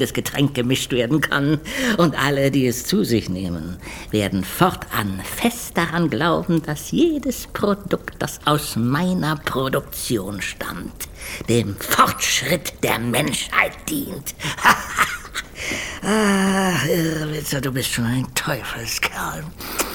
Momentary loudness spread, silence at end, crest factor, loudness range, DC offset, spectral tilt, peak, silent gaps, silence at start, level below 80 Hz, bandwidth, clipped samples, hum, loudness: 9 LU; 0 s; 20 dB; 3 LU; under 0.1%; -4.5 dB/octave; -2 dBFS; none; 0 s; -42 dBFS; 19 kHz; under 0.1%; none; -21 LUFS